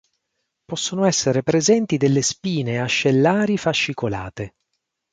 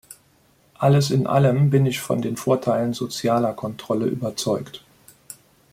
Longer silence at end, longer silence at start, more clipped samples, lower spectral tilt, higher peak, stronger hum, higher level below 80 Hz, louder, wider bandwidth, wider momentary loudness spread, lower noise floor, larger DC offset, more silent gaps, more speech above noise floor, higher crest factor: first, 0.65 s vs 0.4 s; first, 0.7 s vs 0.1 s; neither; second, -4.5 dB/octave vs -6.5 dB/octave; about the same, -4 dBFS vs -4 dBFS; neither; about the same, -54 dBFS vs -58 dBFS; about the same, -19 LUFS vs -21 LUFS; second, 9.6 kHz vs 16 kHz; second, 12 LU vs 22 LU; first, -77 dBFS vs -59 dBFS; neither; neither; first, 57 dB vs 38 dB; about the same, 16 dB vs 18 dB